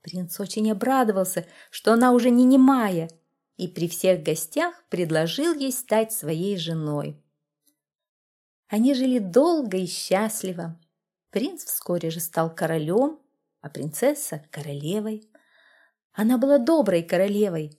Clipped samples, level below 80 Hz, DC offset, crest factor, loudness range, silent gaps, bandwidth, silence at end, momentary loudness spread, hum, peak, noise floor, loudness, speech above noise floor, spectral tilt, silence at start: under 0.1%; -74 dBFS; under 0.1%; 18 dB; 7 LU; 7.95-7.99 s, 8.09-8.63 s, 16.04-16.10 s; 16.5 kHz; 0.1 s; 14 LU; none; -6 dBFS; -73 dBFS; -23 LUFS; 50 dB; -5 dB/octave; 0.05 s